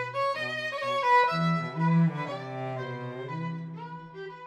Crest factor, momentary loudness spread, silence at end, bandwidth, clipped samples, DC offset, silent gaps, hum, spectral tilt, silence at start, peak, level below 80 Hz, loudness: 16 dB; 17 LU; 0 s; 9 kHz; under 0.1%; under 0.1%; none; none; -7 dB/octave; 0 s; -12 dBFS; -74 dBFS; -28 LUFS